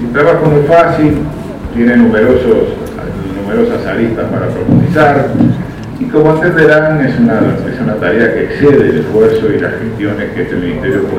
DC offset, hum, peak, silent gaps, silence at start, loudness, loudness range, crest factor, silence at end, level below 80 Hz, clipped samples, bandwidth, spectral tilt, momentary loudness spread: under 0.1%; none; 0 dBFS; none; 0 s; -10 LUFS; 2 LU; 10 dB; 0 s; -32 dBFS; 0.5%; 14 kHz; -8.5 dB/octave; 10 LU